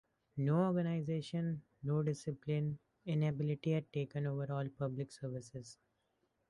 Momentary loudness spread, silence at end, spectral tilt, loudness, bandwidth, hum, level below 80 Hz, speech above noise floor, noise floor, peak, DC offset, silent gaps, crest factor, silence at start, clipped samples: 12 LU; 0.75 s; -8 dB/octave; -38 LUFS; 11 kHz; none; -72 dBFS; 43 dB; -81 dBFS; -22 dBFS; under 0.1%; none; 16 dB; 0.35 s; under 0.1%